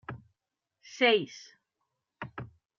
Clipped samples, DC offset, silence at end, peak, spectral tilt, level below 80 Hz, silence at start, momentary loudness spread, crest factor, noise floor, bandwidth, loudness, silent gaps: under 0.1%; under 0.1%; 0.35 s; -12 dBFS; -1.5 dB/octave; -70 dBFS; 0.1 s; 24 LU; 22 dB; -87 dBFS; 7.2 kHz; -26 LUFS; none